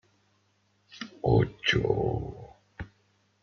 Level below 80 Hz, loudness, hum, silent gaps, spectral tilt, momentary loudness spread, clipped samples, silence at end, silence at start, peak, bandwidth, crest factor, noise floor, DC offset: -48 dBFS; -27 LUFS; none; none; -6.5 dB/octave; 21 LU; under 0.1%; 0.55 s; 0.95 s; -10 dBFS; 7 kHz; 20 dB; -70 dBFS; under 0.1%